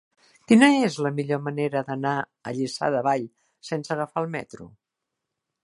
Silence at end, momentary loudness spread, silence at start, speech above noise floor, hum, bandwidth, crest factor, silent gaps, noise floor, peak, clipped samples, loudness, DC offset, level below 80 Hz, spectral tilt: 0.95 s; 17 LU; 0.5 s; 60 dB; none; 11.5 kHz; 22 dB; none; -84 dBFS; -4 dBFS; under 0.1%; -24 LUFS; under 0.1%; -70 dBFS; -5.5 dB/octave